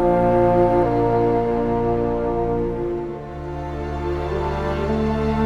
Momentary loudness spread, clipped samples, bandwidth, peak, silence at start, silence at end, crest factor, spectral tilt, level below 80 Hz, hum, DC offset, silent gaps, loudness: 12 LU; under 0.1%; 7.6 kHz; -4 dBFS; 0 s; 0 s; 16 dB; -9 dB/octave; -32 dBFS; none; under 0.1%; none; -21 LUFS